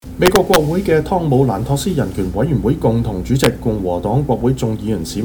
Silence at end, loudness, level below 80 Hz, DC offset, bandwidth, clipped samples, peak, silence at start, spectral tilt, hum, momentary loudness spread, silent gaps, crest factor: 0 s; -16 LUFS; -32 dBFS; under 0.1%; over 20 kHz; under 0.1%; 0 dBFS; 0.05 s; -6 dB/octave; none; 6 LU; none; 16 dB